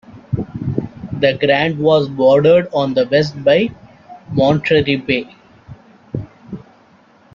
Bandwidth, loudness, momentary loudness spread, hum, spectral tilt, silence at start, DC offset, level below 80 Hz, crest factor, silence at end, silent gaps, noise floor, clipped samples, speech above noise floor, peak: 7.2 kHz; -15 LUFS; 16 LU; none; -7.5 dB/octave; 0.1 s; under 0.1%; -48 dBFS; 16 dB; 0.75 s; none; -49 dBFS; under 0.1%; 35 dB; -2 dBFS